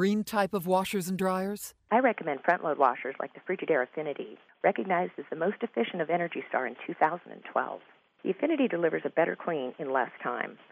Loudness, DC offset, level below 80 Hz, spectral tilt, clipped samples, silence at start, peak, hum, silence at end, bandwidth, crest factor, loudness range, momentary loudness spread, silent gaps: -30 LUFS; under 0.1%; -74 dBFS; -5.5 dB/octave; under 0.1%; 0 s; -10 dBFS; none; 0.15 s; 15.5 kHz; 20 dB; 3 LU; 9 LU; none